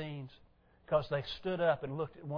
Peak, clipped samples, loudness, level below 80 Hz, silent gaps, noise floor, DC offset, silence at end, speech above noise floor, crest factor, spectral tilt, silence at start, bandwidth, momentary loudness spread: -18 dBFS; under 0.1%; -35 LUFS; -62 dBFS; none; -65 dBFS; under 0.1%; 0 s; 31 dB; 18 dB; -4.5 dB/octave; 0 s; 5.4 kHz; 13 LU